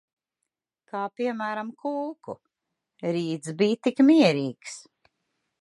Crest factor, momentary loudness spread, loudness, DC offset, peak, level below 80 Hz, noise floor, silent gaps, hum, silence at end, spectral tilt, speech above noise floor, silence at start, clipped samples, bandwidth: 20 dB; 22 LU; -25 LUFS; under 0.1%; -6 dBFS; -78 dBFS; -85 dBFS; none; none; 0.8 s; -6 dB/octave; 60 dB; 0.95 s; under 0.1%; 11.5 kHz